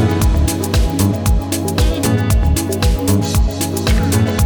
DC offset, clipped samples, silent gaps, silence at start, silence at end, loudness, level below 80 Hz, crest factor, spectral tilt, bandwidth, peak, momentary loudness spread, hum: under 0.1%; under 0.1%; none; 0 s; 0 s; -16 LUFS; -18 dBFS; 10 dB; -5.5 dB/octave; 19.5 kHz; -4 dBFS; 2 LU; none